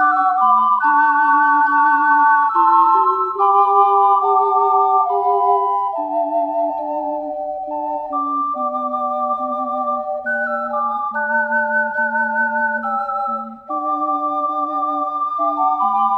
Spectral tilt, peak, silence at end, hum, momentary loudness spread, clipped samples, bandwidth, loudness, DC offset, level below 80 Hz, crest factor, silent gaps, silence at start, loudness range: -6 dB/octave; -2 dBFS; 0 s; none; 9 LU; under 0.1%; 5.2 kHz; -17 LUFS; under 0.1%; -64 dBFS; 16 dB; none; 0 s; 8 LU